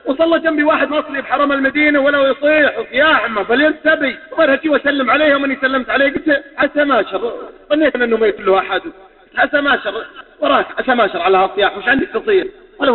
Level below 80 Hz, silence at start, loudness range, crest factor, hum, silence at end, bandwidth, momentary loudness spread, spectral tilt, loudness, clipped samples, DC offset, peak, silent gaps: -48 dBFS; 0.05 s; 3 LU; 14 dB; none; 0 s; 4.3 kHz; 8 LU; -9 dB/octave; -14 LUFS; under 0.1%; under 0.1%; 0 dBFS; none